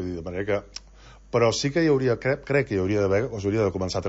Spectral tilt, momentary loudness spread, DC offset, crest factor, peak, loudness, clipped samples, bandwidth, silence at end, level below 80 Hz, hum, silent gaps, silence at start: -5.5 dB/octave; 9 LU; under 0.1%; 16 dB; -8 dBFS; -24 LUFS; under 0.1%; 8 kHz; 0 s; -48 dBFS; none; none; 0 s